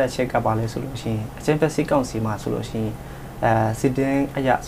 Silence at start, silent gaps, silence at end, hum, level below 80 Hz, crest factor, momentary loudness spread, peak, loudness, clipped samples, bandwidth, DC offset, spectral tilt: 0 s; none; 0 s; none; -42 dBFS; 18 dB; 8 LU; -4 dBFS; -23 LUFS; under 0.1%; 16 kHz; under 0.1%; -6.5 dB/octave